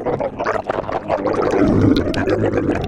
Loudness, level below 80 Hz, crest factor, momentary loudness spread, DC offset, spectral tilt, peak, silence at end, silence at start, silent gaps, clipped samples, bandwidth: -18 LUFS; -34 dBFS; 16 dB; 7 LU; under 0.1%; -7.5 dB/octave; -2 dBFS; 0 s; 0 s; none; under 0.1%; 10.5 kHz